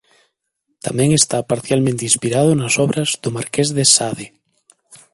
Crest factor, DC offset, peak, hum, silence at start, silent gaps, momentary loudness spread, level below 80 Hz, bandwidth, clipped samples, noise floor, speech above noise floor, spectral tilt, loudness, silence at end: 18 dB; under 0.1%; 0 dBFS; none; 0.85 s; none; 12 LU; -54 dBFS; 12 kHz; under 0.1%; -72 dBFS; 55 dB; -3.5 dB/octave; -16 LUFS; 0.2 s